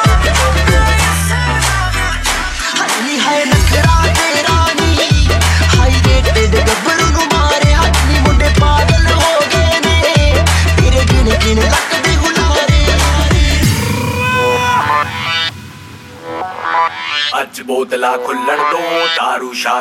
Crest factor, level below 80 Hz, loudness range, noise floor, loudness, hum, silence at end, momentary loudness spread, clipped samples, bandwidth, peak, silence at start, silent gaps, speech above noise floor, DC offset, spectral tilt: 12 dB; -16 dBFS; 5 LU; -32 dBFS; -12 LUFS; none; 0 s; 5 LU; under 0.1%; 15.5 kHz; 0 dBFS; 0 s; none; 17 dB; under 0.1%; -4 dB/octave